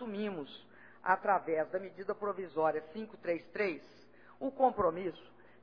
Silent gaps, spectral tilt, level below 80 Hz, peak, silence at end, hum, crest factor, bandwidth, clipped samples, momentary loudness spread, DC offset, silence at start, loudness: none; -4 dB/octave; -70 dBFS; -14 dBFS; 0.35 s; 60 Hz at -65 dBFS; 22 dB; 5.4 kHz; under 0.1%; 15 LU; under 0.1%; 0 s; -35 LUFS